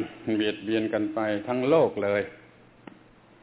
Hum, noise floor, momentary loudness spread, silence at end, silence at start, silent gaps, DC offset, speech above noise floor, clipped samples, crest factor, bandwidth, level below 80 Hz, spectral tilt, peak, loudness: none; -54 dBFS; 7 LU; 1.05 s; 0 s; none; under 0.1%; 28 dB; under 0.1%; 18 dB; 4 kHz; -64 dBFS; -10 dB/octave; -10 dBFS; -26 LUFS